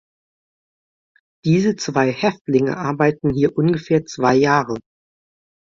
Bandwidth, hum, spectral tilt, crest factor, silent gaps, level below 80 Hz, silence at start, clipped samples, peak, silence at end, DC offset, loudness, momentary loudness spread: 7.6 kHz; none; -6.5 dB/octave; 16 dB; 2.41-2.45 s; -52 dBFS; 1.45 s; under 0.1%; -2 dBFS; 0.8 s; under 0.1%; -18 LUFS; 6 LU